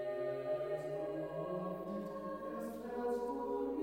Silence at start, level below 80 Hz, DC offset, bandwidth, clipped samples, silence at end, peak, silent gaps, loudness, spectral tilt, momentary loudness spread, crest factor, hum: 0 s; -70 dBFS; under 0.1%; 16 kHz; under 0.1%; 0 s; -28 dBFS; none; -41 LUFS; -7.5 dB/octave; 5 LU; 12 dB; none